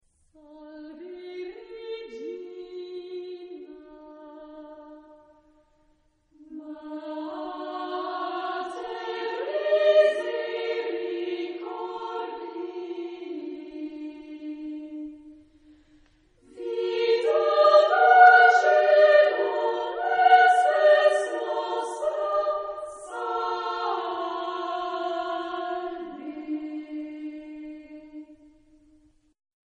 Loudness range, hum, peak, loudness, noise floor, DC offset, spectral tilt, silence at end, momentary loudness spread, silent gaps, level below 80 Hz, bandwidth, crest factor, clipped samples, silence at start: 22 LU; none; -4 dBFS; -23 LUFS; -65 dBFS; under 0.1%; -2 dB/octave; 1.4 s; 23 LU; none; -70 dBFS; 10 kHz; 22 dB; under 0.1%; 0.5 s